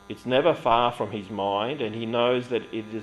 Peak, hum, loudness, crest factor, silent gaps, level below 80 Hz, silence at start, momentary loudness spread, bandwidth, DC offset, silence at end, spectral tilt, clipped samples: -8 dBFS; none; -25 LUFS; 18 dB; none; -60 dBFS; 0.1 s; 9 LU; 12 kHz; under 0.1%; 0 s; -6.5 dB/octave; under 0.1%